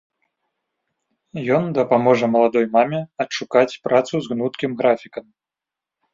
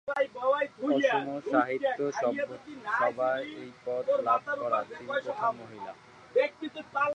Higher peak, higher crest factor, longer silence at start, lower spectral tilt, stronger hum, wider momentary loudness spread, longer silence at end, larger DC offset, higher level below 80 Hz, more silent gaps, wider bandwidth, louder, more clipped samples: first, -2 dBFS vs -12 dBFS; about the same, 20 dB vs 18 dB; first, 1.35 s vs 0.05 s; about the same, -6 dB/octave vs -5 dB/octave; neither; second, 9 LU vs 14 LU; first, 0.95 s vs 0 s; neither; first, -64 dBFS vs -76 dBFS; neither; second, 7.6 kHz vs 9 kHz; first, -19 LUFS vs -30 LUFS; neither